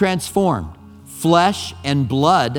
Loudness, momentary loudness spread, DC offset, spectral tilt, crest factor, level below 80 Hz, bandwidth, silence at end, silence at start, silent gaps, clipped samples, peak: -18 LUFS; 10 LU; under 0.1%; -5.5 dB/octave; 18 dB; -46 dBFS; 19 kHz; 0 s; 0 s; none; under 0.1%; 0 dBFS